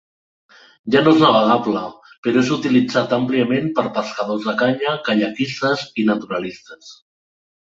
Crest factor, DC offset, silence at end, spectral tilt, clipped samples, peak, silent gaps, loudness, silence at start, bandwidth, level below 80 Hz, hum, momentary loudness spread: 18 dB; under 0.1%; 0.8 s; -6 dB/octave; under 0.1%; -2 dBFS; 2.18-2.23 s; -18 LUFS; 0.85 s; 7.8 kHz; -60 dBFS; none; 13 LU